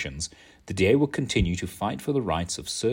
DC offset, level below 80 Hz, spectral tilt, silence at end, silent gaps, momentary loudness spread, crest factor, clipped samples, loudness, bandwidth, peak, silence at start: under 0.1%; -42 dBFS; -5 dB/octave; 0 s; none; 12 LU; 18 dB; under 0.1%; -26 LUFS; 16.5 kHz; -8 dBFS; 0 s